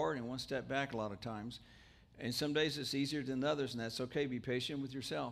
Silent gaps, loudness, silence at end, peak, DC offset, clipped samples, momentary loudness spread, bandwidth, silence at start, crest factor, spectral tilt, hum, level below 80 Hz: none; -39 LUFS; 0 s; -22 dBFS; under 0.1%; under 0.1%; 9 LU; 15.5 kHz; 0 s; 18 dB; -5 dB/octave; none; -68 dBFS